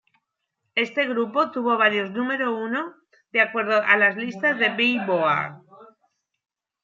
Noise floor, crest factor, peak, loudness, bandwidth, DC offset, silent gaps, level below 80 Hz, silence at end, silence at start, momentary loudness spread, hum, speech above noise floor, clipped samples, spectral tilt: -78 dBFS; 20 dB; -4 dBFS; -22 LUFS; 7.4 kHz; under 0.1%; none; -80 dBFS; 1 s; 0.75 s; 9 LU; none; 56 dB; under 0.1%; -5.5 dB/octave